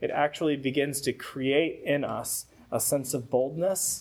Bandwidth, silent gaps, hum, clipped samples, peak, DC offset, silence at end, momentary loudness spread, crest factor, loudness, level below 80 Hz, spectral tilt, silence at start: 18 kHz; none; none; under 0.1%; -10 dBFS; under 0.1%; 0 s; 6 LU; 18 dB; -28 LUFS; -64 dBFS; -3.5 dB/octave; 0 s